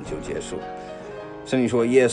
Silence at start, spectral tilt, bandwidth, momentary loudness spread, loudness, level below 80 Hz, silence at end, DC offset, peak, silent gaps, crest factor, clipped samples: 0 s; -5.5 dB/octave; 10 kHz; 17 LU; -24 LUFS; -50 dBFS; 0 s; under 0.1%; -4 dBFS; none; 18 dB; under 0.1%